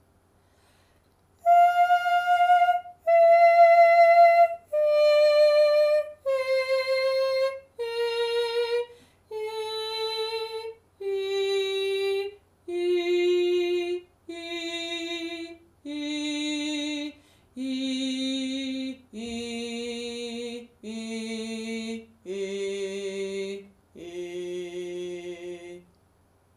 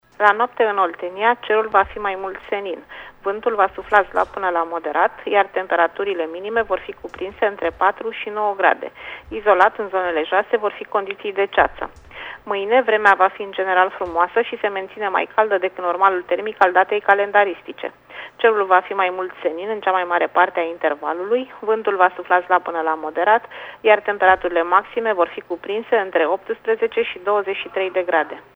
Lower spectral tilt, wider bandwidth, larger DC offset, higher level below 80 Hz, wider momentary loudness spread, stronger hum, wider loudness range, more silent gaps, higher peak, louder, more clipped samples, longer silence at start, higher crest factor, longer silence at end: second, -3.5 dB/octave vs -5 dB/octave; first, 15 kHz vs 7.6 kHz; neither; second, -70 dBFS vs -54 dBFS; first, 19 LU vs 10 LU; neither; first, 15 LU vs 3 LU; neither; second, -8 dBFS vs 0 dBFS; second, -24 LUFS vs -19 LUFS; neither; first, 1.45 s vs 0.2 s; about the same, 16 dB vs 20 dB; first, 0.8 s vs 0.15 s